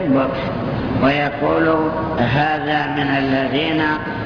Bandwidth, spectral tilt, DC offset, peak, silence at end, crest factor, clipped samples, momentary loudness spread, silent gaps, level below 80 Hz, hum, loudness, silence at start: 5.4 kHz; -8 dB/octave; under 0.1%; -4 dBFS; 0 s; 14 dB; under 0.1%; 5 LU; none; -40 dBFS; none; -18 LUFS; 0 s